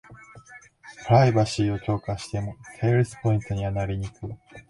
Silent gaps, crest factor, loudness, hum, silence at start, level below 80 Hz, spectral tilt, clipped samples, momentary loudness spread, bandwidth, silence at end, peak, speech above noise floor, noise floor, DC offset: none; 20 dB; -24 LUFS; none; 0.1 s; -46 dBFS; -7 dB/octave; under 0.1%; 19 LU; 11.5 kHz; 0.1 s; -6 dBFS; 25 dB; -49 dBFS; under 0.1%